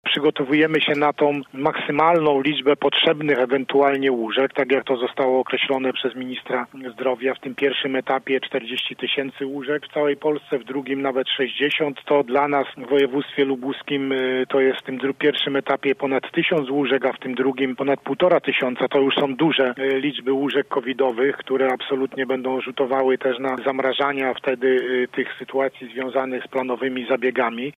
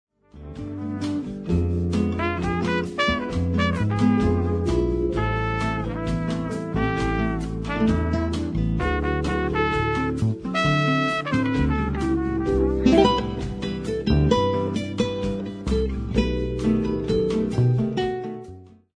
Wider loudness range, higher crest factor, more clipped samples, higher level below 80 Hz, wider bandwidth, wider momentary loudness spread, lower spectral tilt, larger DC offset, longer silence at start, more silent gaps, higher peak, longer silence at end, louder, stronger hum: about the same, 4 LU vs 3 LU; about the same, 16 dB vs 20 dB; neither; second, -70 dBFS vs -32 dBFS; second, 5.6 kHz vs 10.5 kHz; about the same, 7 LU vs 8 LU; about the same, -6.5 dB/octave vs -7 dB/octave; neither; second, 0.05 s vs 0.35 s; neither; about the same, -4 dBFS vs -4 dBFS; second, 0.05 s vs 0.3 s; about the same, -21 LUFS vs -23 LUFS; neither